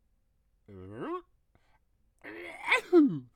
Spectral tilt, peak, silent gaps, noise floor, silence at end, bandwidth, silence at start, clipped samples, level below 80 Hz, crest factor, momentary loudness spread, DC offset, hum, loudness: -5.5 dB/octave; -12 dBFS; none; -71 dBFS; 0.15 s; 11 kHz; 0.7 s; under 0.1%; -70 dBFS; 20 dB; 22 LU; under 0.1%; none; -27 LUFS